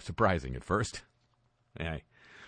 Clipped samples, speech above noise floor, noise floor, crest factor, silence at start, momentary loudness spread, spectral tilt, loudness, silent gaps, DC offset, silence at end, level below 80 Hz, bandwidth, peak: under 0.1%; 40 dB; -72 dBFS; 22 dB; 0 s; 13 LU; -5.5 dB/octave; -33 LUFS; none; under 0.1%; 0 s; -50 dBFS; 10 kHz; -12 dBFS